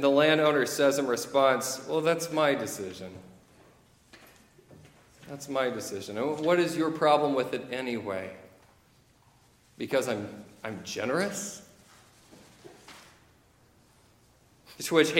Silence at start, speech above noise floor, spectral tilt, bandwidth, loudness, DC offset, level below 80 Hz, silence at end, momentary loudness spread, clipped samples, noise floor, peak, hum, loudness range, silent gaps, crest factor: 0 s; 35 dB; -4 dB/octave; 17 kHz; -28 LUFS; under 0.1%; -70 dBFS; 0 s; 19 LU; under 0.1%; -62 dBFS; -8 dBFS; none; 10 LU; none; 22 dB